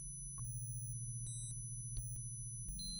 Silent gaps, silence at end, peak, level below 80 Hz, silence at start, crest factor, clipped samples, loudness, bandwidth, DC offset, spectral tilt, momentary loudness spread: none; 0 s; -32 dBFS; -54 dBFS; 0 s; 14 dB; under 0.1%; -45 LUFS; over 20 kHz; under 0.1%; -3 dB/octave; 1 LU